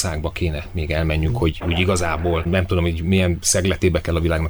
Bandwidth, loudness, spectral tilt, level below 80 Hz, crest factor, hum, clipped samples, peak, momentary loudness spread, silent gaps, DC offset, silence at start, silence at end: over 20 kHz; -20 LUFS; -5 dB/octave; -30 dBFS; 16 dB; none; under 0.1%; -4 dBFS; 6 LU; none; under 0.1%; 0 s; 0 s